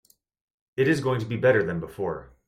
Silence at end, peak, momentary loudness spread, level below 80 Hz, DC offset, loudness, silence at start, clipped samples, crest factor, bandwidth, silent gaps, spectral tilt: 0.2 s; -8 dBFS; 10 LU; -58 dBFS; under 0.1%; -25 LUFS; 0.75 s; under 0.1%; 18 dB; 15 kHz; none; -7 dB/octave